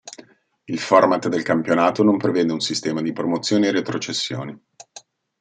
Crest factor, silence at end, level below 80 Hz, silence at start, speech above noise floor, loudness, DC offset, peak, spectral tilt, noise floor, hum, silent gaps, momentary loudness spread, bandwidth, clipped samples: 20 dB; 0.4 s; -66 dBFS; 0.05 s; 28 dB; -20 LUFS; under 0.1%; -2 dBFS; -4.5 dB/octave; -48 dBFS; none; none; 12 LU; 9.4 kHz; under 0.1%